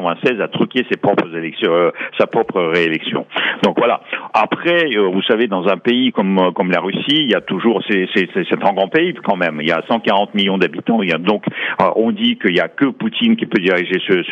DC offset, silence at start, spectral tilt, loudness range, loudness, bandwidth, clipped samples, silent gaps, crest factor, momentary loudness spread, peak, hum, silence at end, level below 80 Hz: under 0.1%; 0 s; -7 dB/octave; 1 LU; -16 LUFS; 7.4 kHz; under 0.1%; none; 14 dB; 3 LU; -2 dBFS; none; 0 s; -66 dBFS